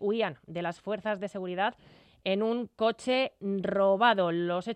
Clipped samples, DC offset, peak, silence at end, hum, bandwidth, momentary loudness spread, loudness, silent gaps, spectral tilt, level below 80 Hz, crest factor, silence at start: under 0.1%; under 0.1%; -12 dBFS; 0 s; none; 10.5 kHz; 11 LU; -29 LUFS; none; -6 dB/octave; -72 dBFS; 18 dB; 0 s